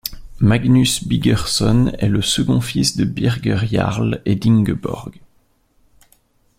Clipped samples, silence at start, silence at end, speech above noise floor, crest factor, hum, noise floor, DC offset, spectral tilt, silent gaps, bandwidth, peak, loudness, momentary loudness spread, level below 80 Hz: under 0.1%; 0.05 s; 1.45 s; 42 dB; 16 dB; none; -58 dBFS; under 0.1%; -5.5 dB/octave; none; 16 kHz; -2 dBFS; -17 LUFS; 6 LU; -36 dBFS